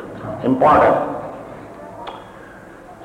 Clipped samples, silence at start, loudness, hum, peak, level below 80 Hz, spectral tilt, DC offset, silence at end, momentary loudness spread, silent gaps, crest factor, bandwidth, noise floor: under 0.1%; 0 s; -16 LUFS; none; -4 dBFS; -46 dBFS; -7.5 dB/octave; under 0.1%; 0 s; 26 LU; none; 16 dB; 15 kHz; -39 dBFS